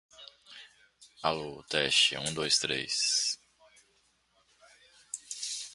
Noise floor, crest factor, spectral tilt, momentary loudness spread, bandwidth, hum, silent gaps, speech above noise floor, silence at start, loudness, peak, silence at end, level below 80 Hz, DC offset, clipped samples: -70 dBFS; 24 dB; -1 dB/octave; 26 LU; 12 kHz; none; none; 40 dB; 0.2 s; -29 LUFS; -10 dBFS; 0 s; -68 dBFS; under 0.1%; under 0.1%